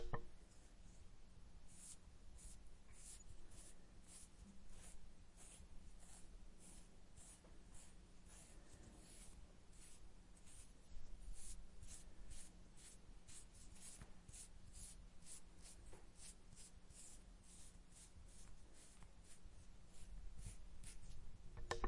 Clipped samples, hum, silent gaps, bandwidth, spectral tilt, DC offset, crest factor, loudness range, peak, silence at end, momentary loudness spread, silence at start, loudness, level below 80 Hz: under 0.1%; none; none; 11.5 kHz; -3.5 dB/octave; under 0.1%; 28 dB; 4 LU; -26 dBFS; 0 s; 8 LU; 0 s; -62 LUFS; -60 dBFS